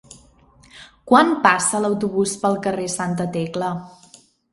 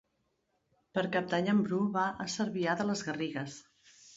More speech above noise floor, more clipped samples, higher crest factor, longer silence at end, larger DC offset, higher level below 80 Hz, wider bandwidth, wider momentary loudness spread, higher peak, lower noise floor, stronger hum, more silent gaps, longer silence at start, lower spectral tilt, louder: second, 33 dB vs 46 dB; neither; about the same, 22 dB vs 18 dB; first, 0.65 s vs 0 s; neither; first, -58 dBFS vs -72 dBFS; first, 11.5 kHz vs 8 kHz; about the same, 10 LU vs 9 LU; first, 0 dBFS vs -16 dBFS; second, -52 dBFS vs -78 dBFS; neither; neither; second, 0.75 s vs 0.95 s; about the same, -4 dB/octave vs -5 dB/octave; first, -19 LUFS vs -32 LUFS